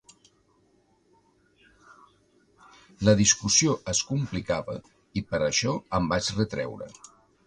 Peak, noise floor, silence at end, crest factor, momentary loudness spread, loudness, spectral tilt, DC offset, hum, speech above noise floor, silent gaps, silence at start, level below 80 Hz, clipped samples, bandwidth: -6 dBFS; -65 dBFS; 0.55 s; 24 dB; 16 LU; -25 LUFS; -3.5 dB/octave; under 0.1%; none; 39 dB; none; 3 s; -52 dBFS; under 0.1%; 11 kHz